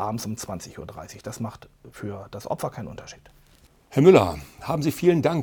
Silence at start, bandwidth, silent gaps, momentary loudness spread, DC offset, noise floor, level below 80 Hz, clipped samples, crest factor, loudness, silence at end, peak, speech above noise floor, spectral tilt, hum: 0 s; 20 kHz; none; 22 LU; under 0.1%; -56 dBFS; -54 dBFS; under 0.1%; 22 dB; -22 LUFS; 0 s; -2 dBFS; 32 dB; -6.5 dB/octave; none